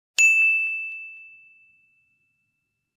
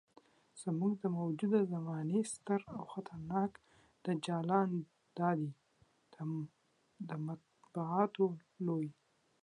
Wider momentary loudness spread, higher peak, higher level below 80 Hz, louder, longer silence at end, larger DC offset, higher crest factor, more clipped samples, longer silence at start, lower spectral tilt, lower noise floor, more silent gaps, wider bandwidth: first, 21 LU vs 12 LU; first, -6 dBFS vs -18 dBFS; second, -86 dBFS vs -78 dBFS; first, -18 LUFS vs -38 LUFS; first, 1.75 s vs 0.5 s; neither; about the same, 20 dB vs 20 dB; neither; second, 0.2 s vs 0.55 s; second, 5 dB/octave vs -7 dB/octave; first, -77 dBFS vs -73 dBFS; neither; first, 15 kHz vs 11 kHz